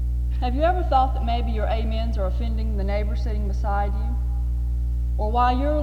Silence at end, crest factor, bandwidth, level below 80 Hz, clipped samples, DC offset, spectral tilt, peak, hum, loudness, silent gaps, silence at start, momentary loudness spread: 0 s; 14 dB; 4.9 kHz; -24 dBFS; under 0.1%; under 0.1%; -8 dB/octave; -6 dBFS; 60 Hz at -25 dBFS; -24 LUFS; none; 0 s; 6 LU